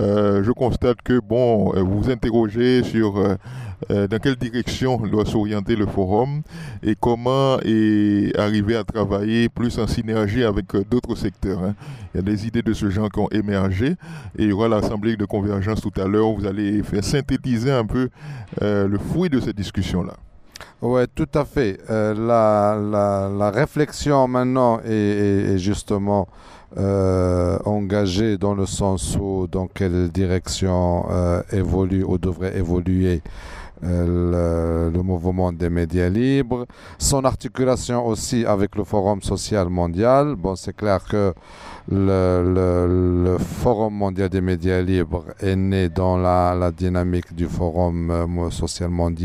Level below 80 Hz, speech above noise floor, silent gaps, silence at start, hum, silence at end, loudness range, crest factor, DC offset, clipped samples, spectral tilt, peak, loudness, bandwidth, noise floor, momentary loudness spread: -36 dBFS; 22 dB; none; 0 s; none; 0 s; 3 LU; 16 dB; under 0.1%; under 0.1%; -6.5 dB/octave; -2 dBFS; -21 LUFS; 14 kHz; -42 dBFS; 7 LU